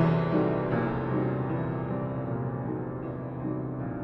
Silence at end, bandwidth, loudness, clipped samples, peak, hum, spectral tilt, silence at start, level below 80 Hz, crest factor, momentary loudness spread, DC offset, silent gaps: 0 s; 5.6 kHz; -30 LUFS; under 0.1%; -12 dBFS; none; -11 dB/octave; 0 s; -52 dBFS; 16 dB; 8 LU; under 0.1%; none